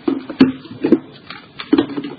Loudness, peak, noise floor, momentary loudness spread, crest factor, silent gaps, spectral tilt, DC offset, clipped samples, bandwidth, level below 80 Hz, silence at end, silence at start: -17 LUFS; 0 dBFS; -37 dBFS; 19 LU; 18 dB; none; -8.5 dB/octave; under 0.1%; 0.1%; 5 kHz; -52 dBFS; 0 s; 0.05 s